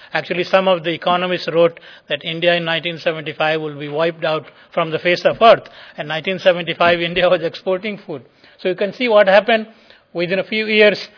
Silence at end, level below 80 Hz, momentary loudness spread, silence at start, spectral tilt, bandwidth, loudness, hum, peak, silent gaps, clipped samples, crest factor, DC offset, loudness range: 0.1 s; -58 dBFS; 13 LU; 0.15 s; -6 dB/octave; 5.4 kHz; -17 LUFS; none; 0 dBFS; none; under 0.1%; 18 dB; under 0.1%; 3 LU